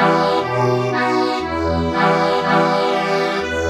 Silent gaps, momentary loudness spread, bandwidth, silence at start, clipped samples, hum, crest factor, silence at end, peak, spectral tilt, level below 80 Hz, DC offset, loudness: none; 4 LU; 13.5 kHz; 0 s; under 0.1%; none; 14 dB; 0 s; -2 dBFS; -6 dB/octave; -40 dBFS; under 0.1%; -17 LUFS